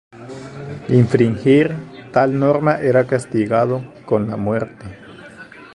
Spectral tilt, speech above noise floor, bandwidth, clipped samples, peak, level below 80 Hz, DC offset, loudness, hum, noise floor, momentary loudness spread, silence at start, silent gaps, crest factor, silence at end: -8 dB/octave; 23 dB; 11 kHz; under 0.1%; 0 dBFS; -50 dBFS; under 0.1%; -17 LUFS; none; -39 dBFS; 22 LU; 0.15 s; none; 18 dB; 0.1 s